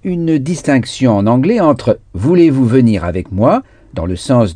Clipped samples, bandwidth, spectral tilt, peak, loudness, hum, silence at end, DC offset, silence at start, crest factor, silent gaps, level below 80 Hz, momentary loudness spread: under 0.1%; 10 kHz; -7.5 dB/octave; 0 dBFS; -13 LUFS; none; 0 s; under 0.1%; 0.05 s; 12 dB; none; -38 dBFS; 9 LU